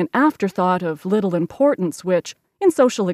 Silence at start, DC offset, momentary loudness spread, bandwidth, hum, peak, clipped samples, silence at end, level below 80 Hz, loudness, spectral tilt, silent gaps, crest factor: 0 s; under 0.1%; 6 LU; 15 kHz; none; -6 dBFS; under 0.1%; 0 s; -66 dBFS; -19 LUFS; -6 dB/octave; none; 14 dB